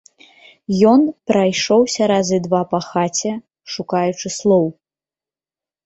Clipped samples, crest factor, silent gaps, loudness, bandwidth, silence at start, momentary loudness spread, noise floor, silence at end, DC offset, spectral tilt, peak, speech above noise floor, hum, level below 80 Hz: under 0.1%; 16 dB; none; -17 LUFS; 8.2 kHz; 0.7 s; 12 LU; under -90 dBFS; 1.15 s; under 0.1%; -5 dB/octave; -2 dBFS; over 74 dB; none; -60 dBFS